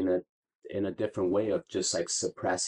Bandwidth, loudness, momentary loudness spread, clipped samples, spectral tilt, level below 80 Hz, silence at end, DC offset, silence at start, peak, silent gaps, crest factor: 11 kHz; -31 LUFS; 6 LU; under 0.1%; -3.5 dB/octave; -68 dBFS; 0 s; under 0.1%; 0 s; -18 dBFS; 0.29-0.43 s, 0.55-0.59 s; 14 dB